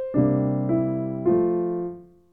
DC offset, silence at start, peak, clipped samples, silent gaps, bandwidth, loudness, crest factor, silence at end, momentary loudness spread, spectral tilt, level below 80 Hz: under 0.1%; 0 s; -8 dBFS; under 0.1%; none; 2.6 kHz; -23 LUFS; 14 dB; 0.3 s; 10 LU; -14 dB/octave; -54 dBFS